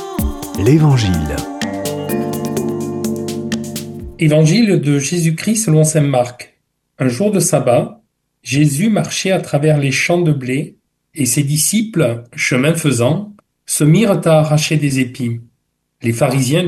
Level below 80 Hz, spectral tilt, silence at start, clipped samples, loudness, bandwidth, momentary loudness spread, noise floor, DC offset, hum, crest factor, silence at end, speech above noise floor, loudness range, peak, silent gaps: -38 dBFS; -5.5 dB/octave; 0 s; under 0.1%; -15 LUFS; 17 kHz; 11 LU; -67 dBFS; under 0.1%; none; 14 dB; 0 s; 53 dB; 3 LU; 0 dBFS; none